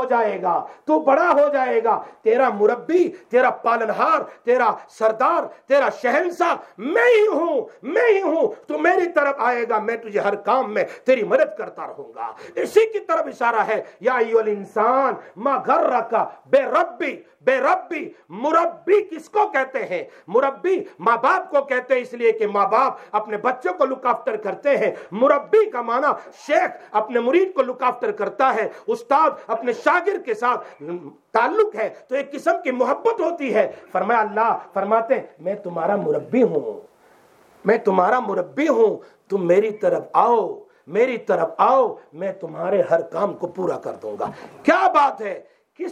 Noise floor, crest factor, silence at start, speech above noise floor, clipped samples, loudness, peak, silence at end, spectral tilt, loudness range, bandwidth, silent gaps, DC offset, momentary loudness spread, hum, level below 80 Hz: -53 dBFS; 18 dB; 0 s; 33 dB; under 0.1%; -20 LUFS; -2 dBFS; 0 s; -5.5 dB/octave; 3 LU; 10.5 kHz; none; under 0.1%; 10 LU; none; -76 dBFS